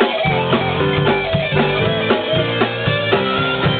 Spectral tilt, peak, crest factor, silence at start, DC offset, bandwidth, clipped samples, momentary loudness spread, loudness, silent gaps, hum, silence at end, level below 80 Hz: -3.5 dB/octave; 0 dBFS; 16 dB; 0 s; under 0.1%; 4.7 kHz; under 0.1%; 2 LU; -16 LUFS; none; none; 0 s; -40 dBFS